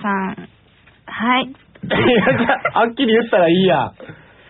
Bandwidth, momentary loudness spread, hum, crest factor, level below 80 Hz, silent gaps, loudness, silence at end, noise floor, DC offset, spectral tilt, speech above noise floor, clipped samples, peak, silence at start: 4.1 kHz; 15 LU; none; 14 dB; -50 dBFS; none; -16 LUFS; 0.35 s; -51 dBFS; under 0.1%; -3.5 dB/octave; 35 dB; under 0.1%; -4 dBFS; 0 s